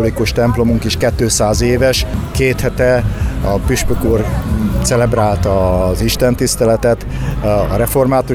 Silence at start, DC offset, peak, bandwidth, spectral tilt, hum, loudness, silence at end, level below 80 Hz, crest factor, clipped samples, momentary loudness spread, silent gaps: 0 s; under 0.1%; -2 dBFS; over 20 kHz; -5 dB/octave; none; -14 LUFS; 0 s; -22 dBFS; 12 dB; under 0.1%; 4 LU; none